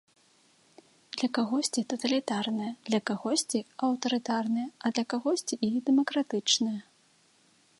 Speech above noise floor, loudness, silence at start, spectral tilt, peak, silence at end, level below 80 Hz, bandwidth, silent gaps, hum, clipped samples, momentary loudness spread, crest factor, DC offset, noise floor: 36 dB; -29 LUFS; 1.15 s; -3 dB/octave; -12 dBFS; 1 s; -80 dBFS; 11.5 kHz; none; none; under 0.1%; 6 LU; 20 dB; under 0.1%; -65 dBFS